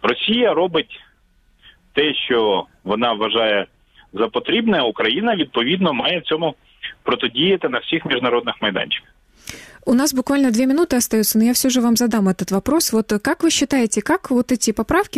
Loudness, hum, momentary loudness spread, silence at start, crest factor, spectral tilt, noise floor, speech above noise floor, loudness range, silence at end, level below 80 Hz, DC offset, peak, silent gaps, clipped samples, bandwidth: -18 LUFS; none; 8 LU; 0.05 s; 16 dB; -3.5 dB/octave; -57 dBFS; 39 dB; 3 LU; 0 s; -48 dBFS; under 0.1%; -2 dBFS; none; under 0.1%; 15.5 kHz